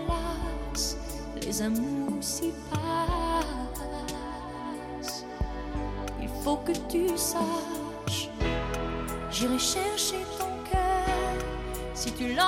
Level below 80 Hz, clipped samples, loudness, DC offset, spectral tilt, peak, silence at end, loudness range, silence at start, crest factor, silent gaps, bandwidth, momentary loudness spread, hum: -38 dBFS; under 0.1%; -31 LUFS; under 0.1%; -4 dB/octave; -12 dBFS; 0 s; 4 LU; 0 s; 18 dB; none; 16.5 kHz; 9 LU; none